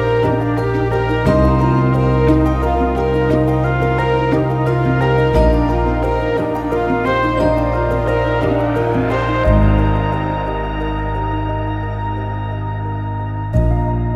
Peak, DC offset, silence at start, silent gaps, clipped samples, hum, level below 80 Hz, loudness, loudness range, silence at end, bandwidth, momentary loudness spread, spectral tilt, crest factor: -2 dBFS; 0.2%; 0 s; none; under 0.1%; none; -24 dBFS; -16 LUFS; 5 LU; 0 s; 11 kHz; 8 LU; -8.5 dB/octave; 14 dB